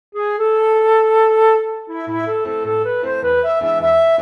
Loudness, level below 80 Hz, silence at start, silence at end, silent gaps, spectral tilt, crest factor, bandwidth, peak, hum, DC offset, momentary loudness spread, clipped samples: -16 LUFS; -52 dBFS; 0.15 s; 0 s; none; -6.5 dB/octave; 12 dB; 5.6 kHz; -2 dBFS; none; under 0.1%; 10 LU; under 0.1%